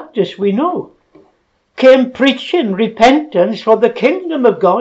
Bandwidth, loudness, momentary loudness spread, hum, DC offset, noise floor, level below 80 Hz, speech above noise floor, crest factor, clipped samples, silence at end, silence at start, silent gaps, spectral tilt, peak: 8 kHz; -12 LUFS; 7 LU; none; under 0.1%; -59 dBFS; -52 dBFS; 47 dB; 12 dB; under 0.1%; 0 s; 0 s; none; -6 dB/octave; 0 dBFS